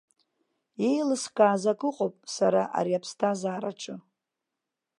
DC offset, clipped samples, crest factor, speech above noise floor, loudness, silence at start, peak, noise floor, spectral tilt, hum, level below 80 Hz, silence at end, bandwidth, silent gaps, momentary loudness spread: under 0.1%; under 0.1%; 20 dB; 60 dB; -27 LUFS; 0.8 s; -8 dBFS; -86 dBFS; -5 dB/octave; none; -82 dBFS; 1 s; 11.5 kHz; none; 14 LU